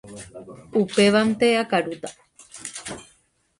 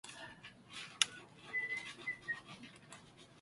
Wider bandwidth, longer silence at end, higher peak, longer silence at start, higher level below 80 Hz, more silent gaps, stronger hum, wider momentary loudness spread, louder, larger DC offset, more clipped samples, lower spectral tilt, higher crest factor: about the same, 11.5 kHz vs 11.5 kHz; first, 0.55 s vs 0 s; about the same, -6 dBFS vs -8 dBFS; about the same, 0.05 s vs 0.05 s; first, -60 dBFS vs -78 dBFS; neither; neither; about the same, 22 LU vs 21 LU; first, -21 LUFS vs -40 LUFS; neither; neither; first, -4.5 dB/octave vs 0 dB/octave; second, 18 dB vs 36 dB